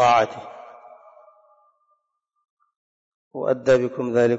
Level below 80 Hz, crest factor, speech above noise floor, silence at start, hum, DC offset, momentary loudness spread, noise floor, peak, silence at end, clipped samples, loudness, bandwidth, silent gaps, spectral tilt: -66 dBFS; 16 dB; 56 dB; 0 s; none; under 0.1%; 23 LU; -75 dBFS; -8 dBFS; 0 s; under 0.1%; -21 LUFS; 8 kHz; 2.50-2.57 s, 2.76-3.31 s; -5.5 dB/octave